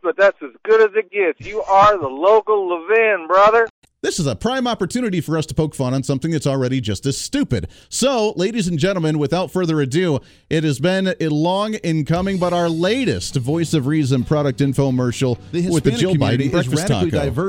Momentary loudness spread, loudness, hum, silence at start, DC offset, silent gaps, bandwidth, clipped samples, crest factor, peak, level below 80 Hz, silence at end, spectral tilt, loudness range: 7 LU; -18 LUFS; none; 0.05 s; under 0.1%; 3.70-3.82 s; 17 kHz; under 0.1%; 16 dB; -2 dBFS; -44 dBFS; 0 s; -5.5 dB/octave; 5 LU